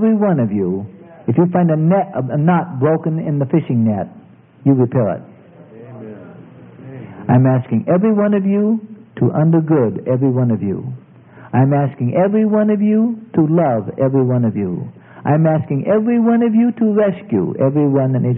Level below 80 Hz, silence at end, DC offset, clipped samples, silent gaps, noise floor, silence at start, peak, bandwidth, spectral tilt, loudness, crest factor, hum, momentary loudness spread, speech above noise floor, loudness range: -60 dBFS; 0 s; under 0.1%; under 0.1%; none; -41 dBFS; 0 s; 0 dBFS; 3.3 kHz; -14.5 dB/octave; -16 LUFS; 16 dB; none; 13 LU; 26 dB; 4 LU